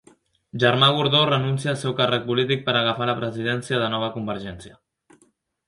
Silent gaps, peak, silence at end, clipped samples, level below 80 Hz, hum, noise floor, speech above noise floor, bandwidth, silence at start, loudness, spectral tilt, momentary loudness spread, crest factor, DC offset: none; 0 dBFS; 1 s; under 0.1%; -58 dBFS; none; -63 dBFS; 41 dB; 11.5 kHz; 0.55 s; -21 LUFS; -5.5 dB/octave; 13 LU; 22 dB; under 0.1%